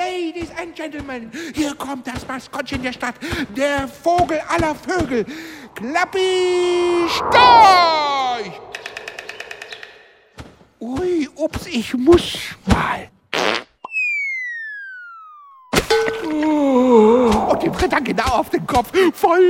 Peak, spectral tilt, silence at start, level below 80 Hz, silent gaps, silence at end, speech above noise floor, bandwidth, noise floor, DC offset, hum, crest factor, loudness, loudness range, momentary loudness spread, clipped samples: 0 dBFS; -4.5 dB/octave; 0 s; -40 dBFS; none; 0 s; 30 dB; 16.5 kHz; -47 dBFS; under 0.1%; none; 18 dB; -17 LUFS; 11 LU; 18 LU; under 0.1%